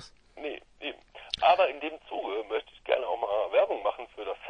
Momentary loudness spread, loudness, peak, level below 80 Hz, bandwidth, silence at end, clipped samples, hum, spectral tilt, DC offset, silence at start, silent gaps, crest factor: 15 LU; -30 LUFS; -10 dBFS; -64 dBFS; 10 kHz; 0 s; under 0.1%; none; -3.5 dB/octave; under 0.1%; 0 s; none; 20 dB